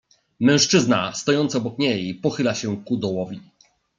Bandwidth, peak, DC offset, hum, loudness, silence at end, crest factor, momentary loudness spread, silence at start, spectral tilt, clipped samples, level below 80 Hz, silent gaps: 9.4 kHz; -4 dBFS; under 0.1%; none; -21 LUFS; 0.6 s; 18 dB; 10 LU; 0.4 s; -4 dB/octave; under 0.1%; -64 dBFS; none